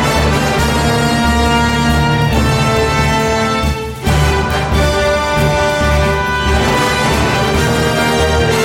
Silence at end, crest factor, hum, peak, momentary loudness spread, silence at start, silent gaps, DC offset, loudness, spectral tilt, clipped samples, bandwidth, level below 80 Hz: 0 s; 12 dB; none; -2 dBFS; 2 LU; 0 s; none; under 0.1%; -13 LUFS; -5 dB/octave; under 0.1%; 16.5 kHz; -20 dBFS